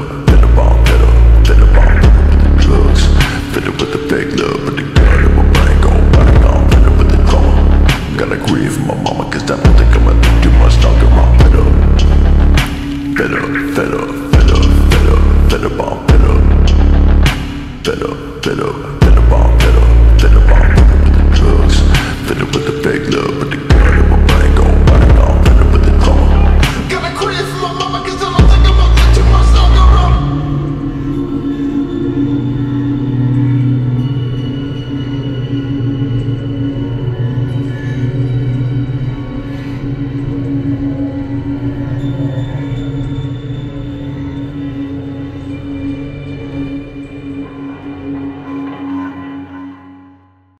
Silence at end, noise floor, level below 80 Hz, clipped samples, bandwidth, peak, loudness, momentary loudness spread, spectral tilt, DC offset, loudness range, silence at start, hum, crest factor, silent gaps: 0.7 s; -45 dBFS; -10 dBFS; under 0.1%; 12 kHz; 0 dBFS; -12 LUFS; 14 LU; -6.5 dB/octave; under 0.1%; 12 LU; 0 s; none; 10 dB; none